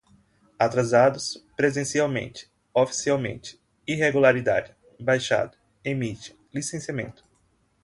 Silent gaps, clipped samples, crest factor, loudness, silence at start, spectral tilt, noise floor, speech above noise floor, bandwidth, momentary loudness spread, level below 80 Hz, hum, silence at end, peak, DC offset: none; under 0.1%; 20 dB; -24 LUFS; 0.6 s; -4.5 dB/octave; -66 dBFS; 42 dB; 11.5 kHz; 19 LU; -60 dBFS; none; 0.7 s; -6 dBFS; under 0.1%